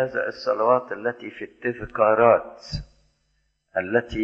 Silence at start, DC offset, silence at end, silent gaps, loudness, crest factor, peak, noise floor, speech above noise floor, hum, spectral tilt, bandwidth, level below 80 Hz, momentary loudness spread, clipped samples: 0 s; under 0.1%; 0 s; none; -22 LUFS; 20 dB; -4 dBFS; -70 dBFS; 47 dB; none; -6.5 dB/octave; 7.6 kHz; -48 dBFS; 17 LU; under 0.1%